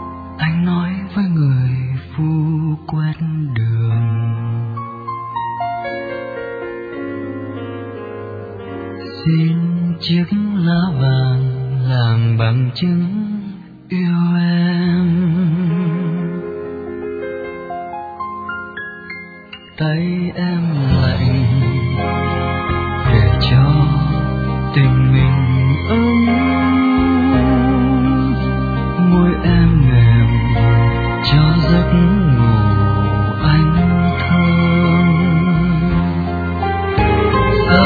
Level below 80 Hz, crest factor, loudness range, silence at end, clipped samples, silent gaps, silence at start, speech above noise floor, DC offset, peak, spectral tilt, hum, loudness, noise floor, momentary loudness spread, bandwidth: -28 dBFS; 14 dB; 10 LU; 0 s; under 0.1%; none; 0 s; 21 dB; under 0.1%; 0 dBFS; -10 dB/octave; none; -15 LUFS; -36 dBFS; 14 LU; 4.9 kHz